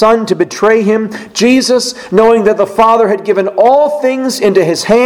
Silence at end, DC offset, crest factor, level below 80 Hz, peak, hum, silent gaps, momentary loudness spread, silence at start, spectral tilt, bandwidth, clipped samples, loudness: 0 s; under 0.1%; 10 dB; -46 dBFS; 0 dBFS; none; none; 5 LU; 0 s; -4.5 dB/octave; 16.5 kHz; 0.7%; -10 LUFS